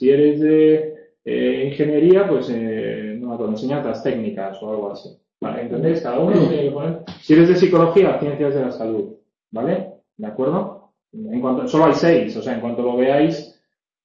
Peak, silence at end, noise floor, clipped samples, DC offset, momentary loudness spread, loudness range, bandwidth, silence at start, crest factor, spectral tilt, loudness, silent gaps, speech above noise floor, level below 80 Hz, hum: -4 dBFS; 0.6 s; -67 dBFS; under 0.1%; under 0.1%; 17 LU; 8 LU; 7.2 kHz; 0 s; 16 dB; -8 dB/octave; -18 LUFS; none; 50 dB; -58 dBFS; none